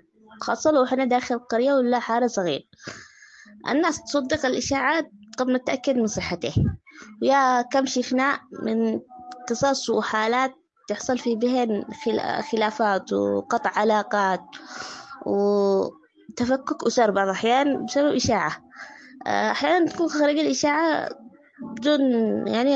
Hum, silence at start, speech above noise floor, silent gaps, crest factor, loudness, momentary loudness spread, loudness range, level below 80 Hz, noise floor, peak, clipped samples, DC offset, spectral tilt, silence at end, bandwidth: none; 0.3 s; 26 dB; none; 16 dB; -23 LUFS; 14 LU; 2 LU; -54 dBFS; -49 dBFS; -6 dBFS; under 0.1%; under 0.1%; -4.5 dB/octave; 0 s; 8.4 kHz